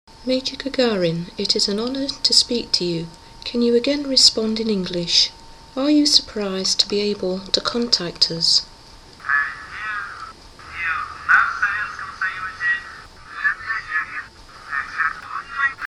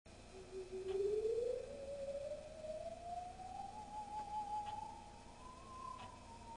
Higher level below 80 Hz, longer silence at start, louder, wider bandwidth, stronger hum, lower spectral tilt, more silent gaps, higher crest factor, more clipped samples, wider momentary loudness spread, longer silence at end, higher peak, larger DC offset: first, -48 dBFS vs -64 dBFS; about the same, 0.1 s vs 0.05 s; first, -19 LUFS vs -46 LUFS; first, 15.5 kHz vs 10 kHz; neither; second, -2.5 dB/octave vs -5 dB/octave; neither; first, 22 dB vs 16 dB; neither; about the same, 15 LU vs 16 LU; about the same, 0.05 s vs 0 s; first, 0 dBFS vs -30 dBFS; neither